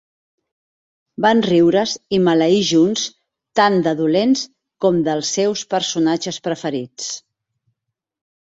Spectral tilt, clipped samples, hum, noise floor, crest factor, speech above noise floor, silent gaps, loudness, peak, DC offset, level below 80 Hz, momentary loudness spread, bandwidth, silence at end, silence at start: -4.5 dB/octave; under 0.1%; none; -79 dBFS; 16 dB; 62 dB; none; -17 LUFS; -2 dBFS; under 0.1%; -60 dBFS; 12 LU; 8 kHz; 1.25 s; 1.2 s